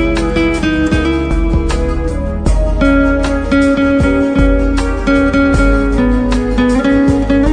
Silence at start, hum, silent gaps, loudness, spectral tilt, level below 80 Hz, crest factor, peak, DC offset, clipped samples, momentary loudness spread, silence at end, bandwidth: 0 s; none; none; -13 LUFS; -7 dB/octave; -16 dBFS; 10 dB; 0 dBFS; under 0.1%; under 0.1%; 4 LU; 0 s; 10 kHz